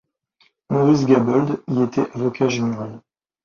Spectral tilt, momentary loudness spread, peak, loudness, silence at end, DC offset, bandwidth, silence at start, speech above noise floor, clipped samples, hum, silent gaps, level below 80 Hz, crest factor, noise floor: -7 dB/octave; 9 LU; -2 dBFS; -19 LUFS; 0.45 s; under 0.1%; 7.2 kHz; 0.7 s; 43 dB; under 0.1%; none; none; -58 dBFS; 18 dB; -62 dBFS